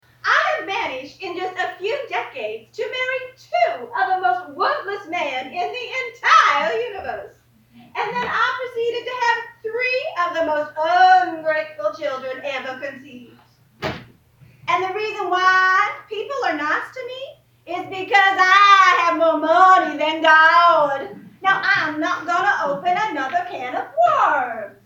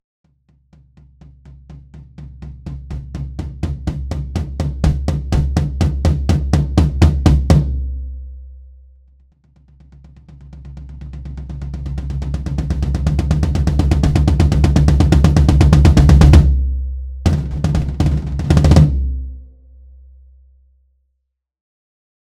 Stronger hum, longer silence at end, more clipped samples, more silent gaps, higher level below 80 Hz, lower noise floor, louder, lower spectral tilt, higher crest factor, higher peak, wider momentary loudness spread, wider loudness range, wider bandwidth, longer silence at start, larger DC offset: neither; second, 0.15 s vs 2.8 s; second, under 0.1% vs 0.2%; neither; second, -64 dBFS vs -20 dBFS; second, -52 dBFS vs -72 dBFS; second, -18 LUFS vs -15 LUFS; second, -3 dB/octave vs -7.5 dB/octave; about the same, 18 dB vs 16 dB; about the same, -2 dBFS vs 0 dBFS; second, 17 LU vs 21 LU; second, 10 LU vs 20 LU; first, 18.5 kHz vs 11 kHz; second, 0.25 s vs 1.5 s; neither